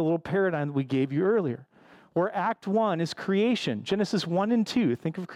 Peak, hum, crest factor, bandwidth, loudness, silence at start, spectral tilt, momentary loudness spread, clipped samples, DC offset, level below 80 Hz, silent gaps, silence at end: -14 dBFS; none; 12 dB; 12.5 kHz; -27 LUFS; 0 s; -6.5 dB/octave; 5 LU; under 0.1%; under 0.1%; -68 dBFS; none; 0 s